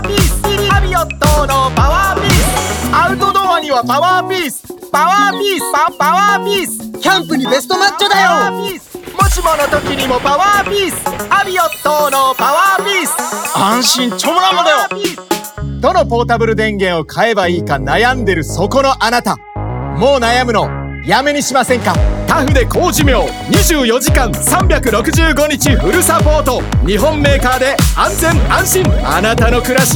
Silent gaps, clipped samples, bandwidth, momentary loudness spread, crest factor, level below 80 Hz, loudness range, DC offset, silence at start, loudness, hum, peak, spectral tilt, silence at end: none; under 0.1%; over 20 kHz; 6 LU; 12 dB; -22 dBFS; 2 LU; under 0.1%; 0 s; -12 LUFS; none; 0 dBFS; -4 dB/octave; 0 s